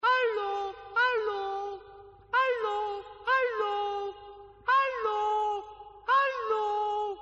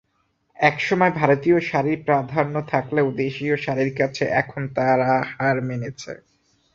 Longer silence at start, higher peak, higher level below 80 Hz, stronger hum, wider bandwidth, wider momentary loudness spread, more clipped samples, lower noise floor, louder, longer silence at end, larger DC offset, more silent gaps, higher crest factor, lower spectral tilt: second, 0.05 s vs 0.6 s; second, -16 dBFS vs 0 dBFS; second, -66 dBFS vs -58 dBFS; neither; about the same, 7.6 kHz vs 7.6 kHz; first, 12 LU vs 8 LU; neither; second, -51 dBFS vs -68 dBFS; second, -29 LUFS vs -21 LUFS; second, 0 s vs 0.6 s; neither; neither; second, 12 dB vs 20 dB; second, 1.5 dB/octave vs -7 dB/octave